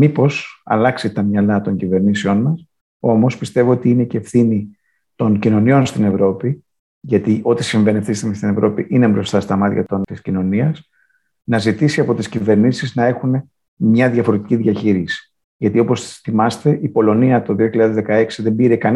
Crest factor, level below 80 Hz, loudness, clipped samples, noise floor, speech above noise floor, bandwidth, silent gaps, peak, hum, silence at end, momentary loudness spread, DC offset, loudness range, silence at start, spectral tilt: 14 dB; -58 dBFS; -16 LUFS; under 0.1%; -61 dBFS; 46 dB; 11.5 kHz; 2.81-3.00 s, 6.79-7.01 s, 13.68-13.77 s, 15.44-15.60 s; -2 dBFS; none; 0 s; 7 LU; under 0.1%; 2 LU; 0 s; -7.5 dB/octave